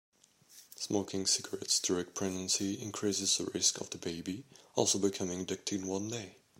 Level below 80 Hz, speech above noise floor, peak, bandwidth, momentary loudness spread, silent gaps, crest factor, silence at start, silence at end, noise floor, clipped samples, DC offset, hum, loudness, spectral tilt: -76 dBFS; 26 dB; -14 dBFS; 16 kHz; 11 LU; none; 22 dB; 0.5 s; 0.25 s; -61 dBFS; under 0.1%; under 0.1%; none; -33 LUFS; -2.5 dB/octave